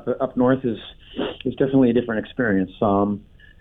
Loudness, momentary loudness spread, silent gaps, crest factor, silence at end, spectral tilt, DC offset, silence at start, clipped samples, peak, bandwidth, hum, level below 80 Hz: -21 LUFS; 12 LU; none; 14 dB; 0.4 s; -10 dB/octave; under 0.1%; 0 s; under 0.1%; -8 dBFS; 4 kHz; none; -50 dBFS